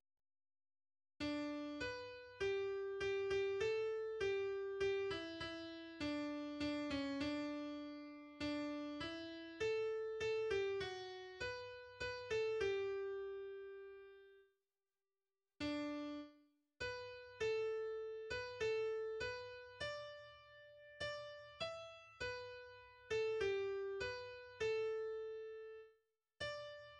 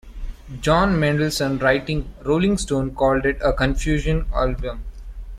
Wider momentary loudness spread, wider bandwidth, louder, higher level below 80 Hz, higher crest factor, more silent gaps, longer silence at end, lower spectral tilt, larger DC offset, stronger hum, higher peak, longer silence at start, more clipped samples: second, 14 LU vs 18 LU; second, 9.8 kHz vs 15.5 kHz; second, -44 LUFS vs -21 LUFS; second, -70 dBFS vs -30 dBFS; about the same, 16 dB vs 16 dB; neither; about the same, 0 s vs 0 s; about the same, -4.5 dB/octave vs -5.5 dB/octave; neither; neither; second, -30 dBFS vs -4 dBFS; first, 1.2 s vs 0.05 s; neither